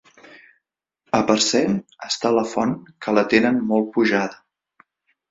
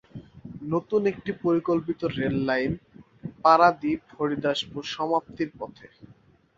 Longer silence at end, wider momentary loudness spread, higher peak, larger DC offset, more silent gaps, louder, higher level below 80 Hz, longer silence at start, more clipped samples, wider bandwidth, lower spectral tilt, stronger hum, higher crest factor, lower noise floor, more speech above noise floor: about the same, 0.95 s vs 0.9 s; second, 9 LU vs 20 LU; about the same, -2 dBFS vs -4 dBFS; neither; neither; first, -20 LUFS vs -25 LUFS; about the same, -60 dBFS vs -56 dBFS; first, 1.15 s vs 0.15 s; neither; about the same, 7.8 kHz vs 7.8 kHz; second, -4 dB/octave vs -6.5 dB/octave; neither; about the same, 20 dB vs 22 dB; first, -77 dBFS vs -57 dBFS; first, 57 dB vs 32 dB